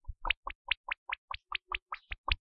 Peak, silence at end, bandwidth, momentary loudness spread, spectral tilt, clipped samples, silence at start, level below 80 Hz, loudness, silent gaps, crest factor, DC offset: -12 dBFS; 0.15 s; 5.6 kHz; 6 LU; 1 dB/octave; under 0.1%; 0.05 s; -46 dBFS; -37 LUFS; 0.37-0.43 s, 0.55-0.65 s, 0.77-0.84 s, 0.98-1.06 s, 1.18-1.28 s, 1.82-1.86 s, 2.18-2.24 s; 26 dB; under 0.1%